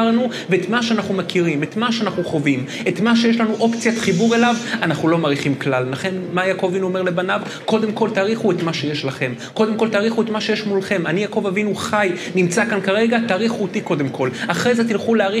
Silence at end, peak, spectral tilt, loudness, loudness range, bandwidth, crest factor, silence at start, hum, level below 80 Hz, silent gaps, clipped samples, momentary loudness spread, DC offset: 0 s; 0 dBFS; -5.5 dB/octave; -19 LUFS; 2 LU; 13 kHz; 18 dB; 0 s; none; -68 dBFS; none; under 0.1%; 5 LU; under 0.1%